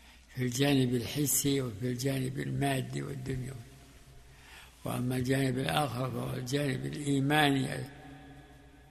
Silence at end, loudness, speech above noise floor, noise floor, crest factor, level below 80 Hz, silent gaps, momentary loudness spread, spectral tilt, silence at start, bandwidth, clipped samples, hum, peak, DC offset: 0.1 s; -31 LUFS; 24 dB; -55 dBFS; 20 dB; -56 dBFS; none; 19 LU; -4.5 dB/octave; 0.05 s; 13.5 kHz; under 0.1%; none; -12 dBFS; under 0.1%